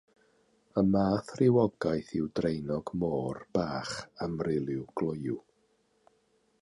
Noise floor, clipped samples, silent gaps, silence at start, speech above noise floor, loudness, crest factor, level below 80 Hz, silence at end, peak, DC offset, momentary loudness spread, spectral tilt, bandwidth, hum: -71 dBFS; under 0.1%; none; 0.75 s; 41 dB; -31 LUFS; 18 dB; -58 dBFS; 1.2 s; -14 dBFS; under 0.1%; 10 LU; -7.5 dB/octave; 11.5 kHz; none